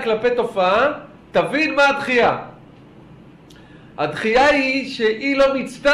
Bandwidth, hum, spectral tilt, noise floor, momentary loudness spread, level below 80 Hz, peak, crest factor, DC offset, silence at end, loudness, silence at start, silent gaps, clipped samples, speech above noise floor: 11.5 kHz; none; -4.5 dB/octave; -44 dBFS; 9 LU; -50 dBFS; -6 dBFS; 14 dB; under 0.1%; 0 s; -18 LUFS; 0 s; none; under 0.1%; 26 dB